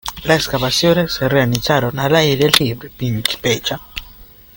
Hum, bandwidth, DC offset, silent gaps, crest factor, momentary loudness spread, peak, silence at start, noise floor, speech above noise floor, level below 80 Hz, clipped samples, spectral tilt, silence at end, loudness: none; 17 kHz; under 0.1%; none; 16 dB; 10 LU; 0 dBFS; 0.05 s; -41 dBFS; 25 dB; -40 dBFS; under 0.1%; -4.5 dB/octave; 0.3 s; -15 LUFS